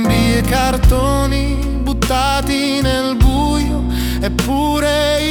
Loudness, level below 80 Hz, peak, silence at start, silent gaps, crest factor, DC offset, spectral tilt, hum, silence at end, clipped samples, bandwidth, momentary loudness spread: -15 LUFS; -20 dBFS; 0 dBFS; 0 s; none; 14 dB; under 0.1%; -5 dB/octave; none; 0 s; under 0.1%; 19.5 kHz; 5 LU